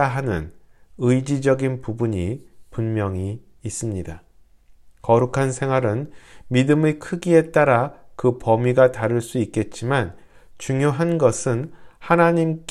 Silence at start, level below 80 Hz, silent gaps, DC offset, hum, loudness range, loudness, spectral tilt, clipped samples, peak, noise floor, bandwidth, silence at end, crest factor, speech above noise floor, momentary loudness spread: 0 s; -48 dBFS; none; under 0.1%; none; 6 LU; -21 LUFS; -6.5 dB/octave; under 0.1%; -2 dBFS; -50 dBFS; 13 kHz; 0 s; 18 dB; 30 dB; 14 LU